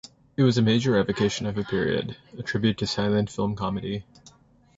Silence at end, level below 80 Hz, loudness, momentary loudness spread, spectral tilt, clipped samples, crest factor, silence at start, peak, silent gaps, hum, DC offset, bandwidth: 0.5 s; -52 dBFS; -25 LUFS; 13 LU; -6 dB/octave; under 0.1%; 18 dB; 0.4 s; -8 dBFS; none; none; under 0.1%; 8 kHz